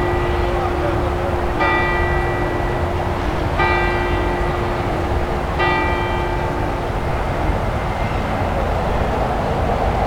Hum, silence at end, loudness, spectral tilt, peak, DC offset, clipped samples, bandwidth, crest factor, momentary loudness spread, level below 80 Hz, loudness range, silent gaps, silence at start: none; 0 s; -20 LUFS; -7 dB/octave; -4 dBFS; under 0.1%; under 0.1%; 17 kHz; 16 dB; 4 LU; -26 dBFS; 2 LU; none; 0 s